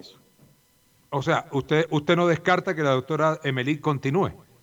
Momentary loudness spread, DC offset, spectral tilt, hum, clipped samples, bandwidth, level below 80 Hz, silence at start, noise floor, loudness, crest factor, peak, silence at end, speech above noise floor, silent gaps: 5 LU; under 0.1%; -6.5 dB/octave; none; under 0.1%; 19.5 kHz; -60 dBFS; 0.05 s; -62 dBFS; -24 LUFS; 18 dB; -6 dBFS; 0.25 s; 38 dB; none